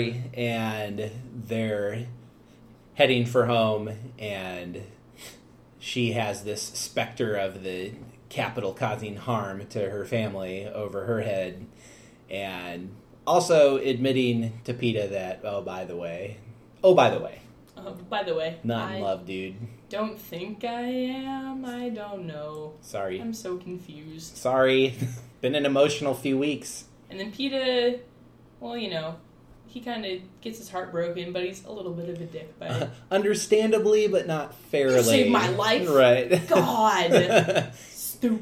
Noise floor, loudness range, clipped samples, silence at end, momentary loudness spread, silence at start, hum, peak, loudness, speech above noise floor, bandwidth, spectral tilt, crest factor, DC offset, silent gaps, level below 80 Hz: -53 dBFS; 11 LU; under 0.1%; 0 s; 18 LU; 0 s; none; -4 dBFS; -26 LUFS; 27 dB; 16.5 kHz; -5 dB/octave; 22 dB; under 0.1%; none; -62 dBFS